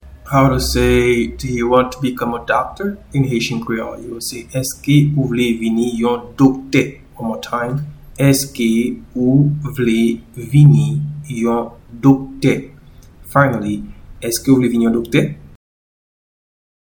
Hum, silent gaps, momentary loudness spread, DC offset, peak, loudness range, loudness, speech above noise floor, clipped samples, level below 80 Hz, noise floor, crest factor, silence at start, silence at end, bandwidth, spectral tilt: none; none; 12 LU; under 0.1%; 0 dBFS; 3 LU; -16 LUFS; 26 dB; under 0.1%; -36 dBFS; -41 dBFS; 16 dB; 0.05 s; 1.4 s; 19.5 kHz; -6 dB/octave